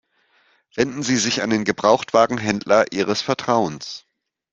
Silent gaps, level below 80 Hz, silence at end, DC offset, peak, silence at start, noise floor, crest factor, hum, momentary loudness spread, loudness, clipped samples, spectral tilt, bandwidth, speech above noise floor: none; -58 dBFS; 0.55 s; under 0.1%; 0 dBFS; 0.75 s; -61 dBFS; 20 dB; none; 12 LU; -19 LUFS; under 0.1%; -4 dB/octave; 8.4 kHz; 42 dB